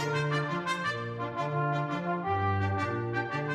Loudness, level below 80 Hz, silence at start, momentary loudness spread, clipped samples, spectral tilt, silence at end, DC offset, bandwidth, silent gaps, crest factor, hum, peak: -31 LUFS; -64 dBFS; 0 s; 4 LU; under 0.1%; -6.5 dB/octave; 0 s; under 0.1%; 11.5 kHz; none; 14 dB; none; -16 dBFS